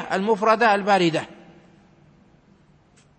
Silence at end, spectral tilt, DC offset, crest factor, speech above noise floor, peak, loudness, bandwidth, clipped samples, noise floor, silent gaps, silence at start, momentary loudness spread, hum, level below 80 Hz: 1.85 s; -5 dB/octave; under 0.1%; 18 dB; 37 dB; -6 dBFS; -20 LUFS; 8.8 kHz; under 0.1%; -56 dBFS; none; 0 s; 10 LU; none; -66 dBFS